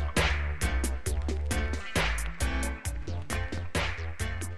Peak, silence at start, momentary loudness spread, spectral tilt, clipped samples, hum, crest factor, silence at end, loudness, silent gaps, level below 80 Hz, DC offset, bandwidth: -14 dBFS; 0 s; 6 LU; -4 dB/octave; under 0.1%; none; 18 dB; 0 s; -32 LUFS; none; -34 dBFS; 1%; 15 kHz